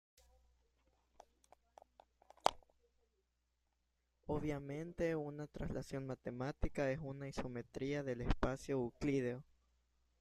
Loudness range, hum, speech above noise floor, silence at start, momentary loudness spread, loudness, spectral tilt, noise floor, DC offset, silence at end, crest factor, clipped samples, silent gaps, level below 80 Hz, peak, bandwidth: 7 LU; none; 43 dB; 2.45 s; 7 LU; -42 LUFS; -6.5 dB/octave; -84 dBFS; under 0.1%; 0.8 s; 32 dB; under 0.1%; none; -54 dBFS; -12 dBFS; 14 kHz